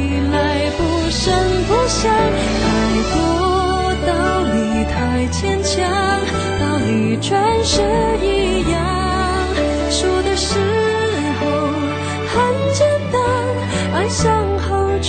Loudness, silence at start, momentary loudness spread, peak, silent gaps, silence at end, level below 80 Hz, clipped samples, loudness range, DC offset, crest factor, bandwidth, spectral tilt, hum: -17 LUFS; 0 s; 3 LU; -4 dBFS; none; 0 s; -28 dBFS; under 0.1%; 1 LU; under 0.1%; 12 dB; 9.4 kHz; -5 dB/octave; none